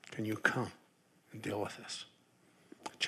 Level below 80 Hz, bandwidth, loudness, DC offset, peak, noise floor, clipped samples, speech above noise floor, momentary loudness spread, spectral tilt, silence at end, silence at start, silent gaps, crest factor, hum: -86 dBFS; 14.5 kHz; -38 LUFS; under 0.1%; -12 dBFS; -69 dBFS; under 0.1%; 31 dB; 17 LU; -4 dB/octave; 0 s; 0.05 s; none; 30 dB; none